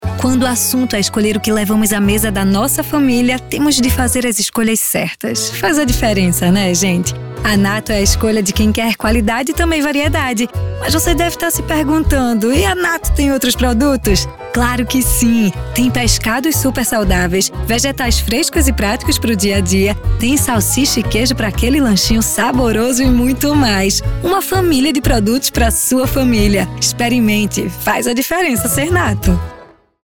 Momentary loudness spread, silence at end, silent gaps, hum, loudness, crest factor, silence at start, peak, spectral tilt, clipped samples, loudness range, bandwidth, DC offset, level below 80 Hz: 4 LU; 0.4 s; none; none; -14 LUFS; 14 dB; 0 s; 0 dBFS; -4 dB/octave; under 0.1%; 1 LU; 19.5 kHz; 0.8%; -24 dBFS